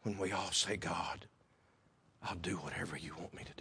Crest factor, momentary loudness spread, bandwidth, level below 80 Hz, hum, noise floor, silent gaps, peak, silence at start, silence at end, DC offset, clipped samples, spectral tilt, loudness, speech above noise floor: 22 dB; 14 LU; 10.5 kHz; -64 dBFS; none; -71 dBFS; none; -20 dBFS; 0 s; 0 s; under 0.1%; under 0.1%; -3 dB/octave; -39 LUFS; 30 dB